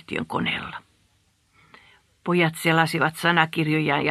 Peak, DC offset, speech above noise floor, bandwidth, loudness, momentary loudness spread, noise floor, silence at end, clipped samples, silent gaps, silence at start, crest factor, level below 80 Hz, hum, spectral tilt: -2 dBFS; under 0.1%; 42 dB; 14 kHz; -22 LUFS; 12 LU; -65 dBFS; 0 s; under 0.1%; none; 0.1 s; 22 dB; -60 dBFS; none; -5.5 dB/octave